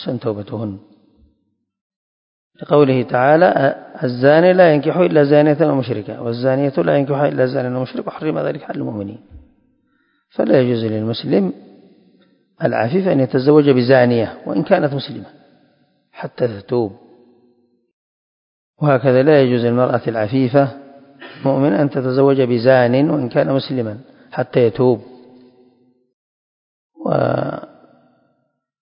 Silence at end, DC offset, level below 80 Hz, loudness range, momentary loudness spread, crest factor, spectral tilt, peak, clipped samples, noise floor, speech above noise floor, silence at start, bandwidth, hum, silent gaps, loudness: 1.15 s; under 0.1%; -58 dBFS; 9 LU; 14 LU; 18 dB; -12 dB/octave; 0 dBFS; under 0.1%; -68 dBFS; 53 dB; 0 s; 5.4 kHz; none; 1.81-1.90 s, 1.96-2.51 s, 17.93-18.74 s, 26.13-26.90 s; -16 LUFS